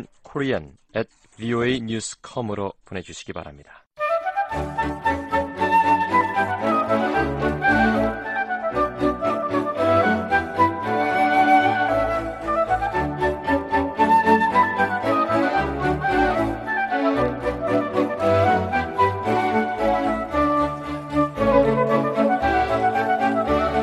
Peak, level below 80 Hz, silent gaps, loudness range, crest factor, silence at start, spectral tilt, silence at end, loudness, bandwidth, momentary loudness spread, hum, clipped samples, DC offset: -4 dBFS; -42 dBFS; 3.87-3.91 s; 7 LU; 16 dB; 0 s; -6 dB/octave; 0 s; -21 LUFS; 13.5 kHz; 11 LU; none; under 0.1%; under 0.1%